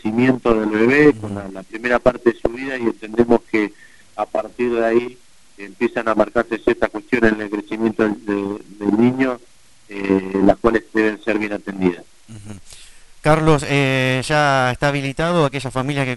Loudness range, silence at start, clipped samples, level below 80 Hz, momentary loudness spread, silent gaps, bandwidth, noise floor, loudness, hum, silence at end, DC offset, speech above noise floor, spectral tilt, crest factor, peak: 3 LU; 0.05 s; under 0.1%; -42 dBFS; 12 LU; none; 11.5 kHz; -47 dBFS; -18 LUFS; none; 0 s; 0.5%; 29 dB; -6.5 dB/octave; 18 dB; 0 dBFS